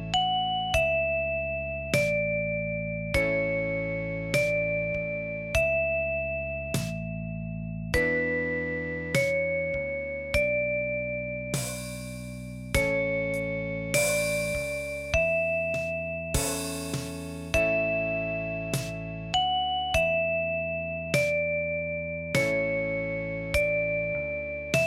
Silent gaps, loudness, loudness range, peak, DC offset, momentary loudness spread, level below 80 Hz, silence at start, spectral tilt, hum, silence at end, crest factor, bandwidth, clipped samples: none; -28 LUFS; 2 LU; -8 dBFS; under 0.1%; 8 LU; -44 dBFS; 0 s; -4 dB/octave; none; 0 s; 20 dB; 16.5 kHz; under 0.1%